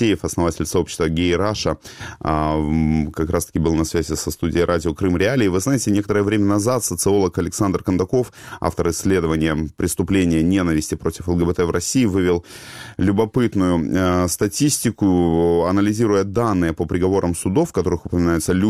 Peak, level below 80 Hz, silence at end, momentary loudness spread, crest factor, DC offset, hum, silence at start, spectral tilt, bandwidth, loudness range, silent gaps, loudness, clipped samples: -2 dBFS; -36 dBFS; 0 s; 5 LU; 16 dB; 0.3%; none; 0 s; -5.5 dB/octave; 16 kHz; 3 LU; none; -19 LUFS; under 0.1%